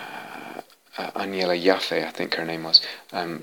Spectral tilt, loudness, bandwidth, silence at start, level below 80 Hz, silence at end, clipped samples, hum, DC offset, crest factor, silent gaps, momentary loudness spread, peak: -3.5 dB/octave; -22 LUFS; 19 kHz; 0 s; -74 dBFS; 0 s; under 0.1%; none; under 0.1%; 24 dB; none; 20 LU; -2 dBFS